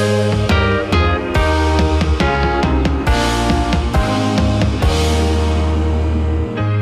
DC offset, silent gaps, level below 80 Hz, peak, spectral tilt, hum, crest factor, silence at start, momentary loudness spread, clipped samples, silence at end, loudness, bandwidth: under 0.1%; none; -20 dBFS; -4 dBFS; -6 dB/octave; none; 10 dB; 0 s; 2 LU; under 0.1%; 0 s; -16 LUFS; 13 kHz